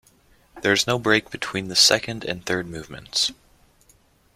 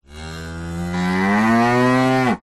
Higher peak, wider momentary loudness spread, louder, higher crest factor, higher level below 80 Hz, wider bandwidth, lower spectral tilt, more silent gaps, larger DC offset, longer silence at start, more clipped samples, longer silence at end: first, -2 dBFS vs -6 dBFS; about the same, 13 LU vs 15 LU; second, -21 LUFS vs -17 LUFS; first, 22 dB vs 12 dB; second, -56 dBFS vs -44 dBFS; first, 16.5 kHz vs 13 kHz; second, -2 dB/octave vs -6.5 dB/octave; neither; neither; first, 0.55 s vs 0.1 s; neither; first, 1 s vs 0.05 s